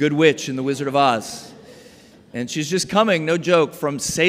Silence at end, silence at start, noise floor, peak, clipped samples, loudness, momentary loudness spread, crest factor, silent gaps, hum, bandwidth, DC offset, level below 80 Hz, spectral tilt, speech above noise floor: 0 s; 0 s; -47 dBFS; -2 dBFS; under 0.1%; -19 LUFS; 12 LU; 18 dB; none; none; 16 kHz; under 0.1%; -56 dBFS; -4 dB/octave; 28 dB